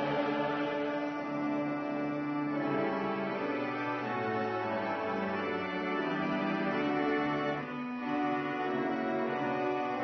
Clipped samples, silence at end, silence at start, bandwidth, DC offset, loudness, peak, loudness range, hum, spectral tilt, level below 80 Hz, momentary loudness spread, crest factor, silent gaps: under 0.1%; 0 s; 0 s; 6.2 kHz; under 0.1%; -33 LUFS; -20 dBFS; 1 LU; none; -4.5 dB/octave; -72 dBFS; 3 LU; 14 dB; none